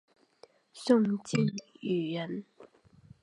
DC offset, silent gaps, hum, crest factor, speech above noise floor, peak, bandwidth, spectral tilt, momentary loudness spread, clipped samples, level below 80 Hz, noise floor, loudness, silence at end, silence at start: under 0.1%; none; none; 22 dB; 31 dB; -10 dBFS; 11 kHz; -6.5 dB/octave; 14 LU; under 0.1%; -74 dBFS; -61 dBFS; -31 LUFS; 0.6 s; 0.75 s